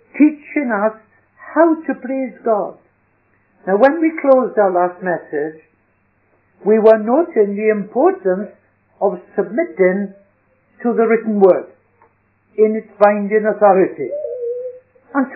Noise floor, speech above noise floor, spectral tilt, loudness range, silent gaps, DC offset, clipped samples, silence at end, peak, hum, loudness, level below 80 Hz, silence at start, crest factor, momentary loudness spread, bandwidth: -60 dBFS; 45 dB; -11 dB/octave; 4 LU; none; under 0.1%; under 0.1%; 0 s; 0 dBFS; none; -16 LUFS; -70 dBFS; 0.15 s; 16 dB; 11 LU; 5.4 kHz